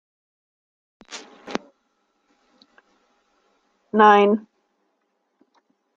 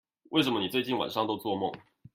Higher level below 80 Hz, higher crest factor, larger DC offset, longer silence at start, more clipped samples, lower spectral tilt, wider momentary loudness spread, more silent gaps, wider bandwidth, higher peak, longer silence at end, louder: about the same, -74 dBFS vs -70 dBFS; about the same, 24 dB vs 20 dB; neither; first, 1.1 s vs 0.3 s; neither; about the same, -5.5 dB/octave vs -5 dB/octave; first, 25 LU vs 7 LU; neither; second, 7.6 kHz vs 16 kHz; first, -2 dBFS vs -10 dBFS; first, 1.55 s vs 0.35 s; first, -18 LUFS vs -30 LUFS